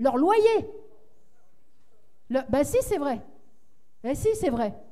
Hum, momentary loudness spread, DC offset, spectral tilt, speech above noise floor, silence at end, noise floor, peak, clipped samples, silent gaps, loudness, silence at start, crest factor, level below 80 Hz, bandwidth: none; 13 LU; 0.7%; -5.5 dB/octave; 46 dB; 0.1 s; -70 dBFS; -8 dBFS; under 0.1%; none; -25 LUFS; 0 s; 18 dB; -50 dBFS; 15.5 kHz